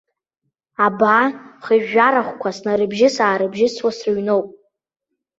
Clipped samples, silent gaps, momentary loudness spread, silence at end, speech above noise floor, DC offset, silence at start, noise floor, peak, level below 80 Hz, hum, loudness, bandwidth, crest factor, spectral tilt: under 0.1%; none; 10 LU; 0.9 s; 62 dB; under 0.1%; 0.8 s; -79 dBFS; -2 dBFS; -64 dBFS; none; -17 LUFS; 7.8 kHz; 16 dB; -5 dB/octave